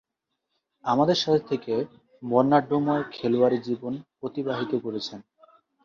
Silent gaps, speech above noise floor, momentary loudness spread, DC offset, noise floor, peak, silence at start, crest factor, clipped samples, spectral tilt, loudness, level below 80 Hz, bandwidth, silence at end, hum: none; 56 dB; 13 LU; under 0.1%; -81 dBFS; -6 dBFS; 0.85 s; 20 dB; under 0.1%; -6.5 dB/octave; -25 LUFS; -68 dBFS; 7.2 kHz; 0.65 s; none